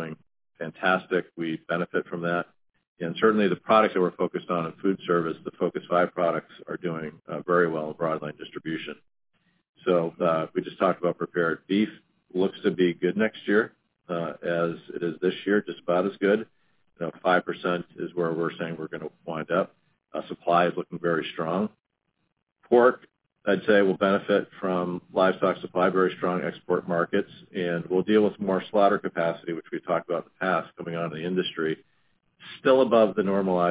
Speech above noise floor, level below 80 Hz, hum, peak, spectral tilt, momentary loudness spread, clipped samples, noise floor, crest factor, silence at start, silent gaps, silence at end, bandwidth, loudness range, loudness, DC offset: 51 dB; -68 dBFS; none; -6 dBFS; -10 dB/octave; 13 LU; under 0.1%; -77 dBFS; 20 dB; 0 s; 2.87-2.96 s, 9.69-9.73 s; 0 s; 4 kHz; 4 LU; -26 LUFS; under 0.1%